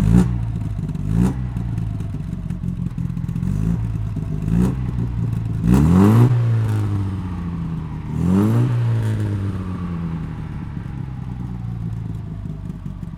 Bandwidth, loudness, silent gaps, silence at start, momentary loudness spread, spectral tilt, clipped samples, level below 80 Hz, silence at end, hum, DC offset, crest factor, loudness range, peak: 13 kHz; -21 LUFS; none; 0 s; 13 LU; -9 dB/octave; under 0.1%; -30 dBFS; 0 s; none; under 0.1%; 18 dB; 9 LU; -2 dBFS